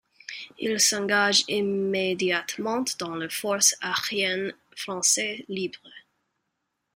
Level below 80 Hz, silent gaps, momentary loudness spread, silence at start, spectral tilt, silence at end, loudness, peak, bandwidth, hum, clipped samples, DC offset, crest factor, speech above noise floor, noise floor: -70 dBFS; none; 14 LU; 0.3 s; -1.5 dB/octave; 0.95 s; -24 LUFS; -6 dBFS; 16 kHz; none; under 0.1%; under 0.1%; 22 dB; 53 dB; -80 dBFS